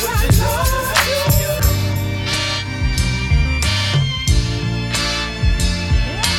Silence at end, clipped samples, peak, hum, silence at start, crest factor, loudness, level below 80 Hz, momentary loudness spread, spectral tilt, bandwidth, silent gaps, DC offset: 0 s; under 0.1%; 0 dBFS; none; 0 s; 16 dB; -17 LUFS; -22 dBFS; 5 LU; -4 dB/octave; 19 kHz; none; under 0.1%